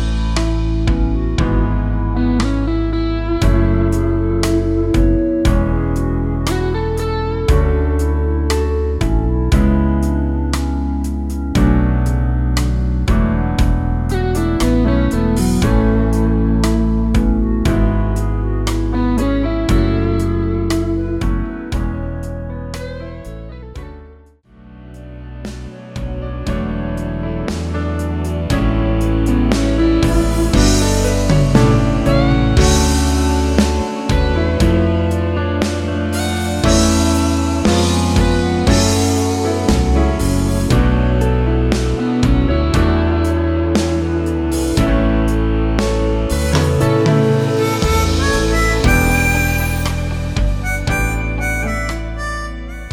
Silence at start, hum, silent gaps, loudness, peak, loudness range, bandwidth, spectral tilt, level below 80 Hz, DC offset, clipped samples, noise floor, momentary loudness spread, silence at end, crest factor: 0 s; none; none; -16 LUFS; 0 dBFS; 8 LU; 16.5 kHz; -6 dB/octave; -20 dBFS; under 0.1%; under 0.1%; -44 dBFS; 9 LU; 0 s; 14 dB